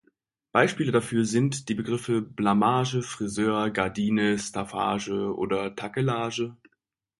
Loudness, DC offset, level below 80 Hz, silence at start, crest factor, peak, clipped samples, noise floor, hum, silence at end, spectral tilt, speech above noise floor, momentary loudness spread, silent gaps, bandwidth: -26 LUFS; under 0.1%; -60 dBFS; 0.55 s; 22 dB; -4 dBFS; under 0.1%; -77 dBFS; none; 0.65 s; -5.5 dB/octave; 51 dB; 7 LU; none; 11.5 kHz